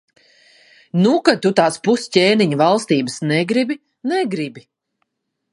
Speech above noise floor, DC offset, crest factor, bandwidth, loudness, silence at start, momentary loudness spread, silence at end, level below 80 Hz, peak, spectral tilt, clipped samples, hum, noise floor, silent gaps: 56 dB; under 0.1%; 18 dB; 11.5 kHz; -17 LUFS; 0.95 s; 10 LU; 0.95 s; -66 dBFS; 0 dBFS; -5.5 dB/octave; under 0.1%; none; -72 dBFS; none